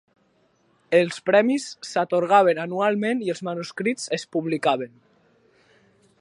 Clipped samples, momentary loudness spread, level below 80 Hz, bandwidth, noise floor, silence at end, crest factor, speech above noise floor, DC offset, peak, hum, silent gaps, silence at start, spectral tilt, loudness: under 0.1%; 10 LU; -76 dBFS; 11.5 kHz; -64 dBFS; 1.35 s; 20 dB; 42 dB; under 0.1%; -2 dBFS; none; none; 0.9 s; -5 dB/octave; -23 LUFS